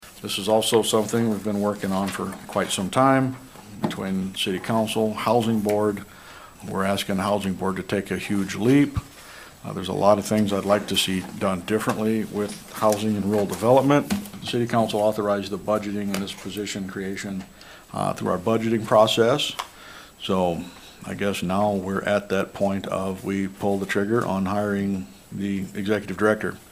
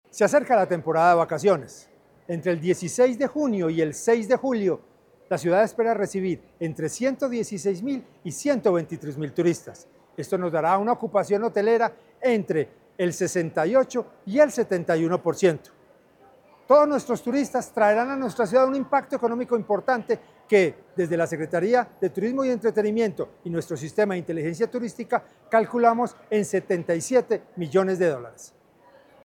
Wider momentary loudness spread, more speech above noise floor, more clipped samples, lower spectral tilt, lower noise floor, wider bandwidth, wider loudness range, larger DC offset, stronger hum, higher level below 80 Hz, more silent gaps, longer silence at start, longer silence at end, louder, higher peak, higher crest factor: first, 13 LU vs 9 LU; second, 21 dB vs 33 dB; neither; about the same, -5 dB/octave vs -6 dB/octave; second, -44 dBFS vs -56 dBFS; about the same, 16 kHz vs 17 kHz; about the same, 3 LU vs 3 LU; neither; neither; first, -54 dBFS vs -68 dBFS; neither; second, 0 s vs 0.15 s; second, 0.1 s vs 0.75 s; about the same, -24 LUFS vs -24 LUFS; about the same, -4 dBFS vs -6 dBFS; about the same, 20 dB vs 18 dB